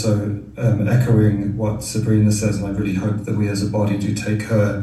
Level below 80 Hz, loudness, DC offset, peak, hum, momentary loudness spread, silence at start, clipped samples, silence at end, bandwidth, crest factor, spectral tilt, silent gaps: -40 dBFS; -19 LUFS; under 0.1%; -4 dBFS; none; 6 LU; 0 s; under 0.1%; 0 s; 12.5 kHz; 14 dB; -7 dB/octave; none